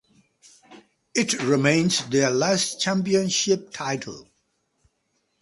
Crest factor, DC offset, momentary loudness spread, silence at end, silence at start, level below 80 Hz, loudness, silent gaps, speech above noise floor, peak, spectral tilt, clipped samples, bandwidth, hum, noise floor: 20 dB; under 0.1%; 10 LU; 1.2 s; 0.7 s; -64 dBFS; -22 LUFS; none; 50 dB; -4 dBFS; -3.5 dB/octave; under 0.1%; 11.5 kHz; none; -72 dBFS